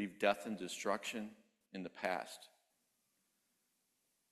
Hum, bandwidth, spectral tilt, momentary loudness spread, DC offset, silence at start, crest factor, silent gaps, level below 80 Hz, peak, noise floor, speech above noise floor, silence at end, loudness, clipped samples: none; 14 kHz; -3.5 dB/octave; 16 LU; under 0.1%; 0 s; 26 dB; none; -84 dBFS; -18 dBFS; -82 dBFS; 41 dB; 1.85 s; -41 LUFS; under 0.1%